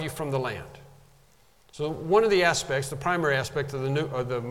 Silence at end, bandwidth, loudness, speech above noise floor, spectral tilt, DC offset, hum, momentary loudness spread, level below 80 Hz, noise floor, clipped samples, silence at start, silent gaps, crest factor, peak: 0 s; 16.5 kHz; -26 LUFS; 34 dB; -4.5 dB/octave; under 0.1%; none; 12 LU; -54 dBFS; -61 dBFS; under 0.1%; 0 s; none; 20 dB; -8 dBFS